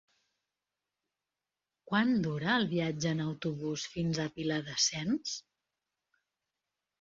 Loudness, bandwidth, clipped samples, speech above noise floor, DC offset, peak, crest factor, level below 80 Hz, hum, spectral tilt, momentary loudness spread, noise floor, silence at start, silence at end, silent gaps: -32 LUFS; 7.8 kHz; under 0.1%; over 58 dB; under 0.1%; -16 dBFS; 20 dB; -68 dBFS; 50 Hz at -60 dBFS; -4 dB/octave; 7 LU; under -90 dBFS; 1.9 s; 1.6 s; none